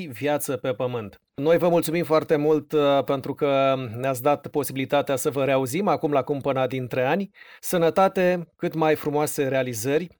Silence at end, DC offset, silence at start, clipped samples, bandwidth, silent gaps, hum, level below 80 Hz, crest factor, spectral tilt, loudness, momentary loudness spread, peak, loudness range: 0.1 s; under 0.1%; 0 s; under 0.1%; over 20 kHz; none; none; -64 dBFS; 16 dB; -5.5 dB/octave; -23 LUFS; 7 LU; -8 dBFS; 2 LU